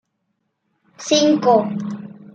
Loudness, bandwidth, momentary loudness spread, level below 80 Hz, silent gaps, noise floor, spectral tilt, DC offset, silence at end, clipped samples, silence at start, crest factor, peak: -17 LUFS; 8.8 kHz; 18 LU; -70 dBFS; none; -72 dBFS; -4.5 dB/octave; under 0.1%; 0.25 s; under 0.1%; 1 s; 18 dB; -2 dBFS